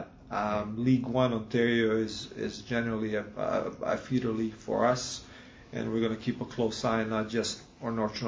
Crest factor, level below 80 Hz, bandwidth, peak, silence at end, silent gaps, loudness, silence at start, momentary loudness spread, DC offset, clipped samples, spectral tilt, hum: 20 dB; -56 dBFS; 8 kHz; -12 dBFS; 0 s; none; -31 LUFS; 0 s; 10 LU; under 0.1%; under 0.1%; -5.5 dB/octave; none